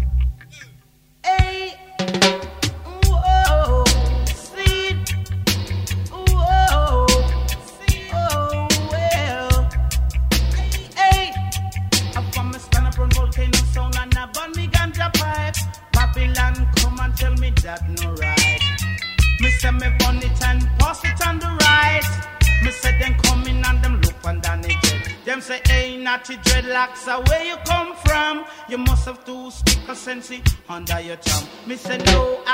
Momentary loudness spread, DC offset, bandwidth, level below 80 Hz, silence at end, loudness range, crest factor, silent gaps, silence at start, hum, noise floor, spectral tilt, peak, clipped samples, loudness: 9 LU; under 0.1%; 16.5 kHz; -22 dBFS; 0 s; 3 LU; 16 dB; none; 0 s; none; -51 dBFS; -4 dB/octave; -2 dBFS; under 0.1%; -19 LUFS